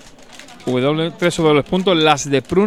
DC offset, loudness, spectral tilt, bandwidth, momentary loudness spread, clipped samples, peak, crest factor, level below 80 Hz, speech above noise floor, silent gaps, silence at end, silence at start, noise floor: 0.4%; -16 LUFS; -5 dB/octave; 14 kHz; 5 LU; under 0.1%; 0 dBFS; 16 dB; -46 dBFS; 25 dB; none; 0 s; 0.3 s; -40 dBFS